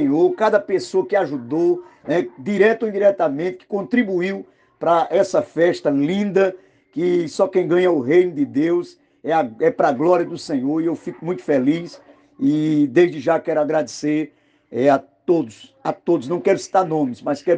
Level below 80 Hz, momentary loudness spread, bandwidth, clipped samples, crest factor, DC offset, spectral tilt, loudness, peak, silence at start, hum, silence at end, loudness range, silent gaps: -68 dBFS; 9 LU; 9.2 kHz; under 0.1%; 16 dB; under 0.1%; -6.5 dB/octave; -19 LUFS; -4 dBFS; 0 s; none; 0 s; 2 LU; none